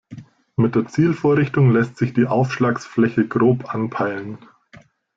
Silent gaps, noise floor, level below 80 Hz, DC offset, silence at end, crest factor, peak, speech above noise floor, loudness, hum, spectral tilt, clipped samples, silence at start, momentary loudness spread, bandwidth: none; -49 dBFS; -56 dBFS; under 0.1%; 0.8 s; 14 dB; -4 dBFS; 31 dB; -19 LUFS; none; -8.5 dB/octave; under 0.1%; 0.1 s; 9 LU; 7.6 kHz